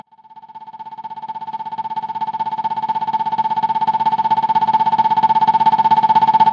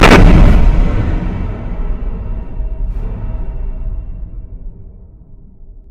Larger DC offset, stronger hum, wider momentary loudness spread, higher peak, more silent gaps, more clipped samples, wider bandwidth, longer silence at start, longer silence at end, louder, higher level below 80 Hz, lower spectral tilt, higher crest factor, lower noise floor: neither; neither; second, 17 LU vs 22 LU; about the same, -2 dBFS vs 0 dBFS; neither; second, under 0.1% vs 0.4%; second, 6.6 kHz vs 10.5 kHz; first, 0.35 s vs 0 s; about the same, 0 s vs 0.1 s; about the same, -16 LUFS vs -15 LUFS; second, -68 dBFS vs -14 dBFS; about the same, -5.5 dB/octave vs -6.5 dB/octave; about the same, 14 dB vs 12 dB; first, -42 dBFS vs -36 dBFS